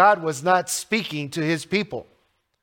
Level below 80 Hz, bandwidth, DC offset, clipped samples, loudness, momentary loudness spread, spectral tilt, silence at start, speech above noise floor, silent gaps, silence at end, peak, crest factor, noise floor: -66 dBFS; 17 kHz; under 0.1%; under 0.1%; -23 LUFS; 8 LU; -4 dB/octave; 0 s; 44 dB; none; 0.6 s; -4 dBFS; 20 dB; -66 dBFS